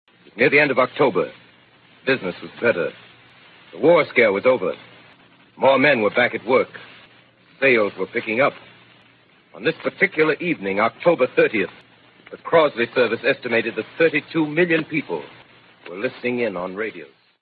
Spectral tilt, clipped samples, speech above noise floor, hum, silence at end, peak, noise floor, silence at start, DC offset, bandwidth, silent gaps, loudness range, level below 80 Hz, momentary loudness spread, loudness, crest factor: -10 dB/octave; under 0.1%; 35 dB; none; 0.35 s; 0 dBFS; -54 dBFS; 0.35 s; under 0.1%; 4.8 kHz; none; 4 LU; -66 dBFS; 13 LU; -20 LUFS; 20 dB